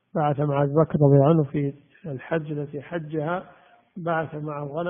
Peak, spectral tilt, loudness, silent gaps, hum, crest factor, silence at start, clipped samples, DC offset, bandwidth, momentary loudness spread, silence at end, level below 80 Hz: -4 dBFS; -8.5 dB/octave; -24 LUFS; none; none; 18 dB; 0.15 s; under 0.1%; under 0.1%; 3.6 kHz; 15 LU; 0 s; -60 dBFS